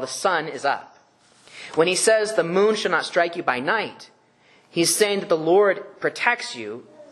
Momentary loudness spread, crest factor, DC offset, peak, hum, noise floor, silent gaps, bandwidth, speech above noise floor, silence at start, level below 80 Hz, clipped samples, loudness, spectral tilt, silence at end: 12 LU; 20 dB; under 0.1%; -2 dBFS; none; -57 dBFS; none; 12 kHz; 35 dB; 0 s; -74 dBFS; under 0.1%; -21 LUFS; -3 dB/octave; 0.1 s